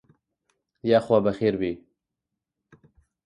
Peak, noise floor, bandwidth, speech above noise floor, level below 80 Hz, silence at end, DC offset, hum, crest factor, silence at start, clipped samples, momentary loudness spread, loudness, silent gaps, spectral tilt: -8 dBFS; -85 dBFS; 10.5 kHz; 63 dB; -60 dBFS; 1.5 s; under 0.1%; none; 20 dB; 0.85 s; under 0.1%; 12 LU; -24 LUFS; none; -8 dB/octave